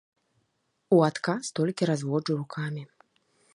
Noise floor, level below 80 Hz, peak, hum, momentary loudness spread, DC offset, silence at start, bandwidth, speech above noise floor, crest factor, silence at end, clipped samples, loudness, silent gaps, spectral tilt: -75 dBFS; -76 dBFS; -8 dBFS; none; 11 LU; under 0.1%; 0.9 s; 11.5 kHz; 49 dB; 20 dB; 0.7 s; under 0.1%; -27 LUFS; none; -6 dB/octave